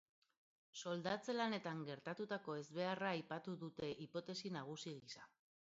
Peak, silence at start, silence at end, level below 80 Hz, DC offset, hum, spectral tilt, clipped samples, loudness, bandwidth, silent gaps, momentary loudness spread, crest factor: -28 dBFS; 0.75 s; 0.4 s; -86 dBFS; under 0.1%; none; -4 dB/octave; under 0.1%; -46 LUFS; 7.6 kHz; none; 10 LU; 18 dB